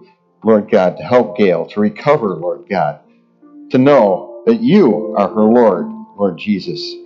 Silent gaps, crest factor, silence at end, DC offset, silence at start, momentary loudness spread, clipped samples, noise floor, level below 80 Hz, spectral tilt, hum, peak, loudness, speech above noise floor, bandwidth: none; 14 dB; 0 s; under 0.1%; 0.45 s; 9 LU; under 0.1%; -47 dBFS; -62 dBFS; -8 dB/octave; none; 0 dBFS; -14 LUFS; 34 dB; 7 kHz